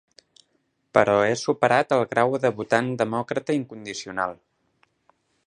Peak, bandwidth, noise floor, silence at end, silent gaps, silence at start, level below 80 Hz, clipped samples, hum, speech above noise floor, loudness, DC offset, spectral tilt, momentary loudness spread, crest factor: -2 dBFS; 10.5 kHz; -71 dBFS; 1.1 s; none; 0.95 s; -64 dBFS; under 0.1%; none; 48 dB; -23 LUFS; under 0.1%; -5 dB/octave; 10 LU; 24 dB